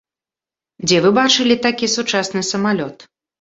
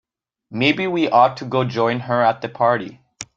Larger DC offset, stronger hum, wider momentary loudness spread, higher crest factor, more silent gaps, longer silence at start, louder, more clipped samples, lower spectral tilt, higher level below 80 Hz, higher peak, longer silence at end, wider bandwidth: neither; neither; about the same, 9 LU vs 11 LU; about the same, 16 dB vs 18 dB; neither; first, 0.8 s vs 0.5 s; about the same, -16 LUFS vs -18 LUFS; neither; second, -3.5 dB/octave vs -5.5 dB/octave; about the same, -58 dBFS vs -62 dBFS; about the same, -2 dBFS vs -2 dBFS; first, 0.35 s vs 0.15 s; second, 8 kHz vs 9.2 kHz